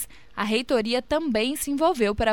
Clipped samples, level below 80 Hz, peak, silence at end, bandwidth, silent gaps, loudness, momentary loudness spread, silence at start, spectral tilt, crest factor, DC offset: under 0.1%; -46 dBFS; -10 dBFS; 0 s; 17.5 kHz; none; -24 LUFS; 4 LU; 0 s; -4 dB/octave; 14 dB; 0.5%